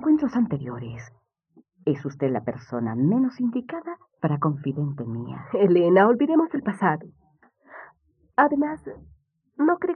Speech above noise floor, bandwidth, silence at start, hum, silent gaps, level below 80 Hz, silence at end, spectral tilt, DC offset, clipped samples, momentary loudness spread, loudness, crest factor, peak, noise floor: 38 dB; 8.8 kHz; 0 s; none; none; -64 dBFS; 0 s; -9.5 dB/octave; under 0.1%; under 0.1%; 17 LU; -24 LUFS; 20 dB; -4 dBFS; -61 dBFS